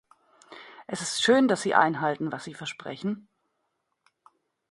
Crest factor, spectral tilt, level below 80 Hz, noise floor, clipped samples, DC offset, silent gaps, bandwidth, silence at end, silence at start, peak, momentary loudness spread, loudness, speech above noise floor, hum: 24 dB; -4 dB/octave; -72 dBFS; -78 dBFS; under 0.1%; under 0.1%; none; 11.5 kHz; 1.5 s; 0.5 s; -6 dBFS; 19 LU; -26 LUFS; 52 dB; none